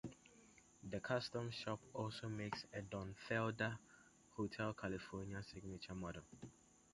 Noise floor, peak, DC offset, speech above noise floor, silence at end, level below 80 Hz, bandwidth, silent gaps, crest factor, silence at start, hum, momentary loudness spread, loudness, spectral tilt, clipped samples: -68 dBFS; -26 dBFS; under 0.1%; 22 dB; 0.35 s; -68 dBFS; 11.5 kHz; none; 22 dB; 0.05 s; none; 18 LU; -47 LUFS; -5.5 dB/octave; under 0.1%